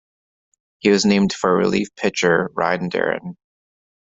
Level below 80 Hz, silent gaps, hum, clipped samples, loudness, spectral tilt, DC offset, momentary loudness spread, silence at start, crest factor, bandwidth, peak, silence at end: -56 dBFS; none; none; under 0.1%; -19 LUFS; -5 dB/octave; under 0.1%; 7 LU; 0.85 s; 18 dB; 7.8 kHz; -2 dBFS; 0.75 s